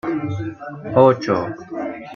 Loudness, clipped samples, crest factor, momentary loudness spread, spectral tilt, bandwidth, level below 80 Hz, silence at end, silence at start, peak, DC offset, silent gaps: -19 LUFS; under 0.1%; 18 dB; 15 LU; -8 dB/octave; 7 kHz; -54 dBFS; 0 s; 0.05 s; -2 dBFS; under 0.1%; none